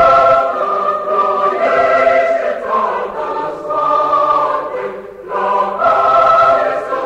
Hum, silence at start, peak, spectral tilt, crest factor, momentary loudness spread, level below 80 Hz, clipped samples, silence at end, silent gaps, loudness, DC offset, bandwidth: none; 0 s; 0 dBFS; -5 dB/octave; 12 dB; 11 LU; -48 dBFS; under 0.1%; 0 s; none; -13 LUFS; under 0.1%; 8.6 kHz